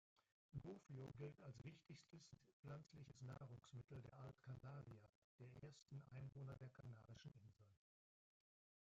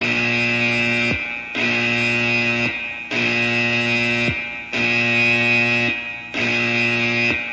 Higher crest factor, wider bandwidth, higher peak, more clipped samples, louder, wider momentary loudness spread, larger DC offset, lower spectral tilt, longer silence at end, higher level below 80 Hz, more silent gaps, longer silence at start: about the same, 18 dB vs 14 dB; second, 7.6 kHz vs 9.6 kHz; second, -42 dBFS vs -6 dBFS; neither; second, -61 LUFS vs -18 LUFS; about the same, 8 LU vs 8 LU; neither; first, -7 dB/octave vs -4.5 dB/octave; first, 1.05 s vs 0 s; second, -82 dBFS vs -50 dBFS; first, 2.53-2.63 s, 5.09-5.38 s vs none; first, 0.55 s vs 0 s